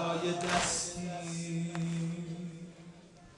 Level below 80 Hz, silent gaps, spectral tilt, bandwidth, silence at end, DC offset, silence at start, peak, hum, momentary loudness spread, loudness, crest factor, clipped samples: -60 dBFS; none; -4 dB/octave; 11.5 kHz; 0 s; under 0.1%; 0 s; -16 dBFS; none; 19 LU; -35 LUFS; 18 dB; under 0.1%